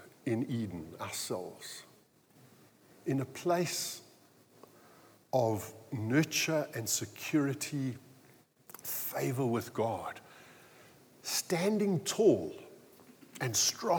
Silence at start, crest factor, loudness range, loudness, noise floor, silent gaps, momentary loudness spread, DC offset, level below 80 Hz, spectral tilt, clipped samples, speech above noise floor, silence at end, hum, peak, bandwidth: 0 s; 20 dB; 5 LU; -33 LUFS; -64 dBFS; none; 17 LU; under 0.1%; -78 dBFS; -4 dB/octave; under 0.1%; 31 dB; 0 s; none; -14 dBFS; over 20 kHz